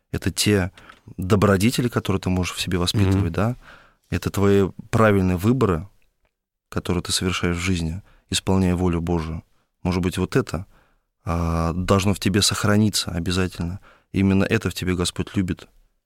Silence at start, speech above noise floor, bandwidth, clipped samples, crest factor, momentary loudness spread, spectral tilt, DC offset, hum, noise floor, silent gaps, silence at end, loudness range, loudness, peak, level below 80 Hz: 0.15 s; 50 dB; 16.5 kHz; under 0.1%; 16 dB; 12 LU; -5 dB/octave; under 0.1%; none; -71 dBFS; none; 0.5 s; 3 LU; -22 LUFS; -6 dBFS; -40 dBFS